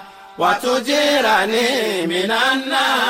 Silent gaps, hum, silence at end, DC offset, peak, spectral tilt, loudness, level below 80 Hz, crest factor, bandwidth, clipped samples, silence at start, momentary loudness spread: none; none; 0 s; under 0.1%; -4 dBFS; -2.5 dB/octave; -17 LUFS; -60 dBFS; 12 dB; 16 kHz; under 0.1%; 0 s; 4 LU